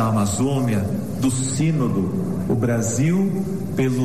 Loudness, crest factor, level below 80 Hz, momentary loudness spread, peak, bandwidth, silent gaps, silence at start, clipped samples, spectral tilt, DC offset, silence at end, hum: -21 LUFS; 10 dB; -46 dBFS; 4 LU; -10 dBFS; 13.5 kHz; none; 0 s; under 0.1%; -6.5 dB/octave; 1%; 0 s; none